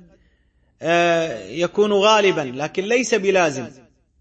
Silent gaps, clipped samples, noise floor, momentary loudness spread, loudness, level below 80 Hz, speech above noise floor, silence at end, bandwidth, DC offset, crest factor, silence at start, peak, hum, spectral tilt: none; under 0.1%; -61 dBFS; 12 LU; -19 LUFS; -60 dBFS; 42 dB; 0.5 s; 8.6 kHz; under 0.1%; 18 dB; 0.8 s; -2 dBFS; none; -4 dB/octave